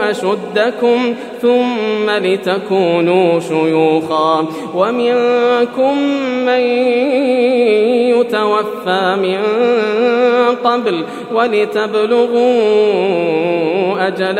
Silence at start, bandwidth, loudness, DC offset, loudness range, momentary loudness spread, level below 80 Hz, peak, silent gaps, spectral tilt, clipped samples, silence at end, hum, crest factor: 0 s; 10.5 kHz; -14 LUFS; under 0.1%; 1 LU; 4 LU; -70 dBFS; 0 dBFS; none; -6 dB/octave; under 0.1%; 0 s; none; 12 dB